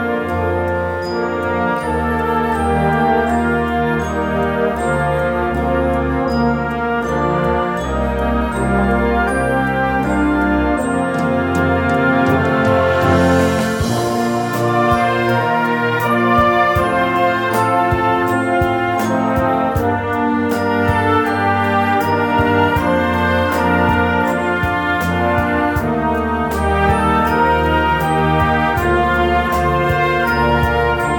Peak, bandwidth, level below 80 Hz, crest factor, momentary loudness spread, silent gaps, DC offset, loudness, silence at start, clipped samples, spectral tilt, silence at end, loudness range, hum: -2 dBFS; 18 kHz; -30 dBFS; 14 dB; 4 LU; none; under 0.1%; -16 LUFS; 0 s; under 0.1%; -6.5 dB/octave; 0 s; 2 LU; none